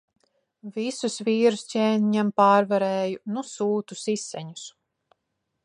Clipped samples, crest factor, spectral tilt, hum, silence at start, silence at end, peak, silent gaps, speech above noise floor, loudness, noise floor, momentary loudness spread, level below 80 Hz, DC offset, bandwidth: under 0.1%; 20 dB; -5 dB/octave; none; 0.65 s; 0.95 s; -6 dBFS; none; 55 dB; -24 LUFS; -79 dBFS; 18 LU; -78 dBFS; under 0.1%; 11 kHz